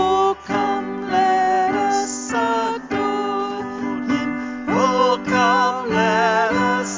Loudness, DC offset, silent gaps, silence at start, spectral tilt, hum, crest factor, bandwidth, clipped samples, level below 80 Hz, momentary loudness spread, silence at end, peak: -19 LUFS; under 0.1%; none; 0 s; -4 dB/octave; none; 16 dB; 7.6 kHz; under 0.1%; -52 dBFS; 8 LU; 0 s; -4 dBFS